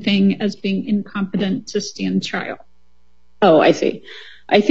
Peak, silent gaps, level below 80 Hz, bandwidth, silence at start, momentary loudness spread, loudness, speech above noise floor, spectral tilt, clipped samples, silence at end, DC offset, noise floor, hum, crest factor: 0 dBFS; none; -60 dBFS; 7.8 kHz; 0 s; 18 LU; -18 LUFS; 43 dB; -6 dB/octave; under 0.1%; 0 s; 0.7%; -61 dBFS; none; 18 dB